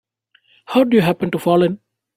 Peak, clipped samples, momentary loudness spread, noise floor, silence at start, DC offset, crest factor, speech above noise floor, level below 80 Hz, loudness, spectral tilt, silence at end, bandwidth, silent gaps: -2 dBFS; under 0.1%; 6 LU; -59 dBFS; 0.7 s; under 0.1%; 16 dB; 43 dB; -56 dBFS; -17 LUFS; -7 dB/octave; 0.4 s; 16 kHz; none